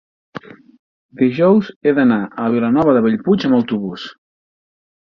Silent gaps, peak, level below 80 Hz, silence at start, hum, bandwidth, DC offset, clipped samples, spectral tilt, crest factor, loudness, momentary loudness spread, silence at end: 0.79-1.09 s, 1.76-1.81 s; 0 dBFS; -56 dBFS; 0.35 s; none; 6.2 kHz; under 0.1%; under 0.1%; -8.5 dB/octave; 16 dB; -15 LUFS; 21 LU; 0.9 s